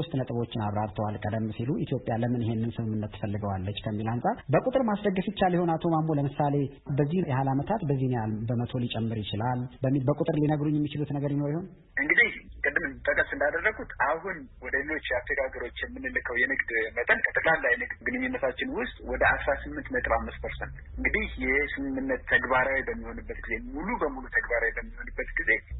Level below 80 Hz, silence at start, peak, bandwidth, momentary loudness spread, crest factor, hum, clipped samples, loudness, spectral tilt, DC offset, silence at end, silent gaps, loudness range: -46 dBFS; 0 s; -10 dBFS; 4.1 kHz; 9 LU; 18 dB; none; under 0.1%; -28 LUFS; -11 dB/octave; under 0.1%; 0 s; none; 3 LU